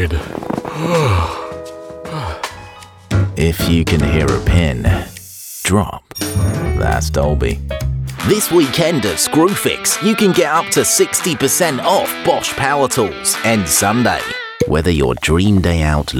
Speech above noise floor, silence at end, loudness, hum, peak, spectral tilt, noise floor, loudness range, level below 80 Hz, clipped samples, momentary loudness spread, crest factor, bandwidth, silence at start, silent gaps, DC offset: 22 dB; 0 s; -15 LUFS; none; 0 dBFS; -4.5 dB/octave; -37 dBFS; 5 LU; -26 dBFS; under 0.1%; 11 LU; 14 dB; 20 kHz; 0 s; none; under 0.1%